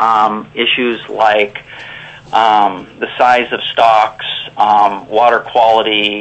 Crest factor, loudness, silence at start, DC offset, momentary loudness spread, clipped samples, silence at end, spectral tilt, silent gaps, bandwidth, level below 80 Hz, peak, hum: 12 dB; -12 LUFS; 0 s; under 0.1%; 13 LU; under 0.1%; 0 s; -4 dB/octave; none; 8.4 kHz; -54 dBFS; 0 dBFS; none